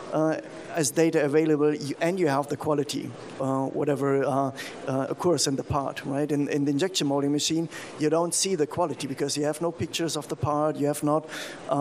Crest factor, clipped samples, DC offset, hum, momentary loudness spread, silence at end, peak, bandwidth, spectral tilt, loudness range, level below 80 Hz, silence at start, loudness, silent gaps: 16 dB; under 0.1%; under 0.1%; none; 7 LU; 0 s; -10 dBFS; 15.5 kHz; -4.5 dB/octave; 2 LU; -64 dBFS; 0 s; -26 LUFS; none